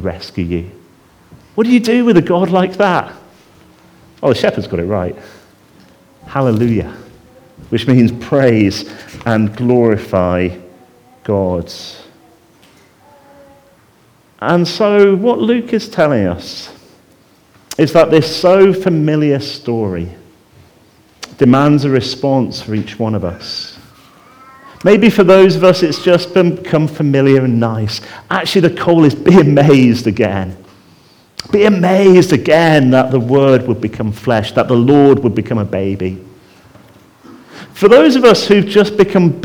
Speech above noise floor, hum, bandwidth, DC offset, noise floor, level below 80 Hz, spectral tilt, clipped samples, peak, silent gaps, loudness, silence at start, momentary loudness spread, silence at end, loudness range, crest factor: 38 dB; none; 18 kHz; under 0.1%; -49 dBFS; -48 dBFS; -7 dB/octave; under 0.1%; 0 dBFS; none; -12 LUFS; 0 s; 15 LU; 0 s; 8 LU; 12 dB